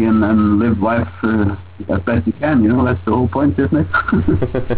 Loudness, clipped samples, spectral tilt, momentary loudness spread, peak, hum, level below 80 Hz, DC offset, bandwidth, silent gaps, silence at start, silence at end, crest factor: -16 LUFS; under 0.1%; -12 dB/octave; 5 LU; -4 dBFS; none; -30 dBFS; 0.8%; 4 kHz; none; 0 s; 0 s; 10 dB